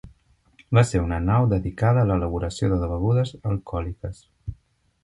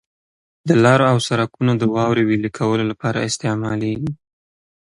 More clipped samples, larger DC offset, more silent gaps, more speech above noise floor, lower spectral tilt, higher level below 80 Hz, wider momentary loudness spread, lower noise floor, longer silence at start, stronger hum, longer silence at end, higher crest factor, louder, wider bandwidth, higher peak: neither; neither; neither; second, 39 dB vs over 73 dB; first, -7.5 dB/octave vs -6 dB/octave; first, -36 dBFS vs -54 dBFS; first, 17 LU vs 10 LU; second, -60 dBFS vs under -90 dBFS; second, 0.05 s vs 0.65 s; neither; second, 0.5 s vs 0.8 s; about the same, 18 dB vs 18 dB; second, -23 LUFS vs -18 LUFS; about the same, 11 kHz vs 11.5 kHz; second, -4 dBFS vs 0 dBFS